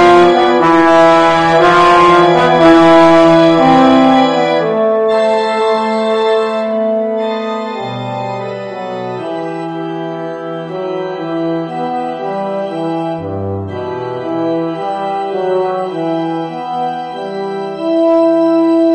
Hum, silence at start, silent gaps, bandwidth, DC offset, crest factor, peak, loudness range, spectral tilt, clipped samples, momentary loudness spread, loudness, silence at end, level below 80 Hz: none; 0 s; none; 9.8 kHz; under 0.1%; 12 dB; 0 dBFS; 13 LU; -6 dB/octave; 0.3%; 14 LU; -12 LUFS; 0 s; -46 dBFS